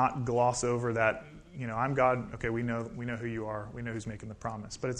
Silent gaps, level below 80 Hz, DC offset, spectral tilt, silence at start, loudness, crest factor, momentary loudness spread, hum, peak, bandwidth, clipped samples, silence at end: none; -54 dBFS; under 0.1%; -5.5 dB/octave; 0 s; -32 LUFS; 20 dB; 12 LU; none; -12 dBFS; 10.5 kHz; under 0.1%; 0 s